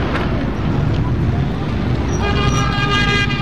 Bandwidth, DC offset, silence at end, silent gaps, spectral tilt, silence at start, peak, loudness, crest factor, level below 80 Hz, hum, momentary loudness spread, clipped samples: 10 kHz; 3%; 0 s; none; -5.5 dB/octave; 0 s; -2 dBFS; -17 LUFS; 14 dB; -24 dBFS; none; 5 LU; under 0.1%